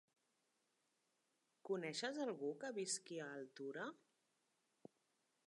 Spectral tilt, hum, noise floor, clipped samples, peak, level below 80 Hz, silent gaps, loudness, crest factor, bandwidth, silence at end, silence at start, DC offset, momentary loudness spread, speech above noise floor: -3 dB/octave; none; -86 dBFS; under 0.1%; -30 dBFS; under -90 dBFS; none; -47 LUFS; 20 dB; 11 kHz; 1.5 s; 1.65 s; under 0.1%; 23 LU; 39 dB